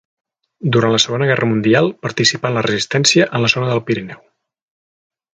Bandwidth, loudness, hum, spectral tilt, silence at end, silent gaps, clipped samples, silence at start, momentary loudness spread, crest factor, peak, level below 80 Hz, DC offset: 9.4 kHz; -15 LUFS; none; -4 dB/octave; 1.25 s; none; under 0.1%; 0.6 s; 8 LU; 18 dB; 0 dBFS; -56 dBFS; under 0.1%